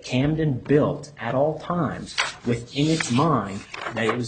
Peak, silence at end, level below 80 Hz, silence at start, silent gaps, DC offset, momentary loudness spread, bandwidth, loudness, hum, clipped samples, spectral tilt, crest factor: -6 dBFS; 0 s; -50 dBFS; 0 s; none; under 0.1%; 8 LU; 9.4 kHz; -24 LUFS; none; under 0.1%; -5.5 dB/octave; 18 dB